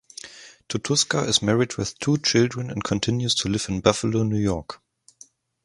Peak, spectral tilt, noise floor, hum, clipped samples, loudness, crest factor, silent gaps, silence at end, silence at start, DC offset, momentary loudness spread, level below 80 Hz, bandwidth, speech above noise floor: 0 dBFS; -4 dB/octave; -53 dBFS; none; under 0.1%; -23 LUFS; 24 dB; none; 0.9 s; 0.25 s; under 0.1%; 14 LU; -48 dBFS; 11.5 kHz; 31 dB